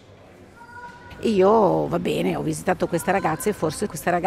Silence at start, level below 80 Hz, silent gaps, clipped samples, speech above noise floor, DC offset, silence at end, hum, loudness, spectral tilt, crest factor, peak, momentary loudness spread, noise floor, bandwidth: 0.4 s; -50 dBFS; none; under 0.1%; 26 dB; under 0.1%; 0 s; none; -22 LUFS; -5.5 dB/octave; 16 dB; -8 dBFS; 23 LU; -47 dBFS; 16 kHz